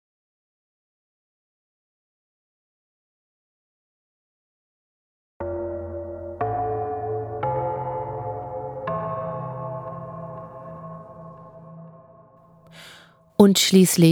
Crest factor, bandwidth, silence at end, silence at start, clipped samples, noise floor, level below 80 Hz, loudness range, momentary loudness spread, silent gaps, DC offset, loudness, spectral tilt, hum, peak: 26 dB; 19.5 kHz; 0 s; 5.4 s; under 0.1%; -52 dBFS; -54 dBFS; 15 LU; 28 LU; none; under 0.1%; -24 LUFS; -5 dB/octave; none; 0 dBFS